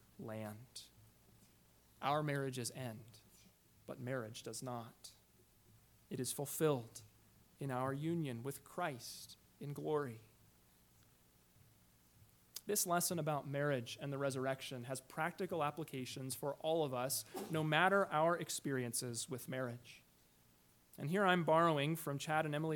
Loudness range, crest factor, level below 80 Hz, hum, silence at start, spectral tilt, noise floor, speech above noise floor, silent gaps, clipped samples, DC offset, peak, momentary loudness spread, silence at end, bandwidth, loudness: 10 LU; 24 dB; -78 dBFS; 60 Hz at -75 dBFS; 0.2 s; -4.5 dB/octave; -70 dBFS; 31 dB; none; under 0.1%; under 0.1%; -18 dBFS; 19 LU; 0 s; 19 kHz; -40 LUFS